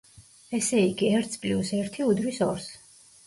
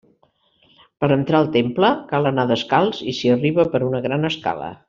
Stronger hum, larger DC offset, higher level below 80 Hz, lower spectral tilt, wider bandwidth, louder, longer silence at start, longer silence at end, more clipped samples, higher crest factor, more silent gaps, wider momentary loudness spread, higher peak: neither; neither; about the same, -60 dBFS vs -56 dBFS; second, -5 dB/octave vs -7 dB/octave; first, 11.5 kHz vs 7.4 kHz; second, -26 LUFS vs -19 LUFS; second, 0.2 s vs 1 s; first, 0.5 s vs 0.15 s; neither; about the same, 16 dB vs 16 dB; neither; first, 8 LU vs 5 LU; second, -12 dBFS vs -4 dBFS